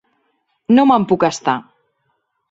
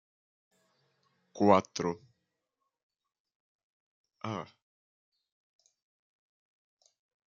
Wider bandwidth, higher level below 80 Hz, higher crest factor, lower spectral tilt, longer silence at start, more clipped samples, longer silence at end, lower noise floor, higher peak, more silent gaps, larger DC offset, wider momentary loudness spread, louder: about the same, 8 kHz vs 7.4 kHz; first, -58 dBFS vs -80 dBFS; second, 16 dB vs 28 dB; about the same, -5.5 dB/octave vs -5.5 dB/octave; second, 0.7 s vs 1.35 s; neither; second, 0.9 s vs 2.85 s; second, -68 dBFS vs -85 dBFS; first, -2 dBFS vs -8 dBFS; second, none vs 2.83-2.90 s, 3.20-3.25 s, 3.35-4.04 s; neither; second, 12 LU vs 19 LU; first, -15 LUFS vs -30 LUFS